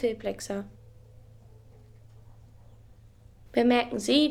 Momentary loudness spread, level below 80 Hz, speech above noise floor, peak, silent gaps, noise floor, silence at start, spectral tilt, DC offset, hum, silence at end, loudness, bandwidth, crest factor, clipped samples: 13 LU; -58 dBFS; 28 dB; -10 dBFS; none; -53 dBFS; 0 s; -4 dB/octave; under 0.1%; none; 0 s; -27 LUFS; 15 kHz; 20 dB; under 0.1%